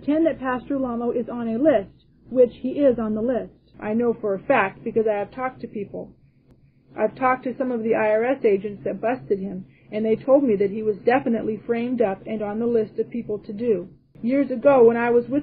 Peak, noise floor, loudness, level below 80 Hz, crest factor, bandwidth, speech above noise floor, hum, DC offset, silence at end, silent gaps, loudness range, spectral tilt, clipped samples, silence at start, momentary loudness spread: -4 dBFS; -56 dBFS; -22 LUFS; -56 dBFS; 18 dB; 4.7 kHz; 34 dB; none; under 0.1%; 0 s; none; 3 LU; -10.5 dB/octave; under 0.1%; 0 s; 12 LU